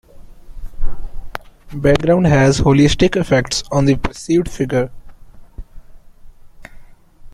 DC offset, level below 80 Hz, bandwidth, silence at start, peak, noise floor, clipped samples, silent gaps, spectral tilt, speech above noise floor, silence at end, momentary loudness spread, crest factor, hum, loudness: under 0.1%; -28 dBFS; 12 kHz; 0.15 s; 0 dBFS; -38 dBFS; under 0.1%; none; -6 dB/octave; 24 dB; 0.05 s; 20 LU; 16 dB; none; -15 LUFS